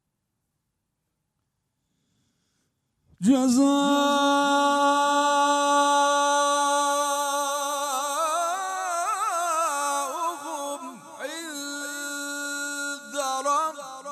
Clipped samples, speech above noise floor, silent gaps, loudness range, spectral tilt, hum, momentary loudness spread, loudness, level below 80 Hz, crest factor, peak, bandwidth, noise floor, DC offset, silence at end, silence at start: under 0.1%; 59 dB; none; 9 LU; -2 dB/octave; none; 12 LU; -24 LUFS; -78 dBFS; 16 dB; -10 dBFS; 15 kHz; -79 dBFS; under 0.1%; 0 s; 3.2 s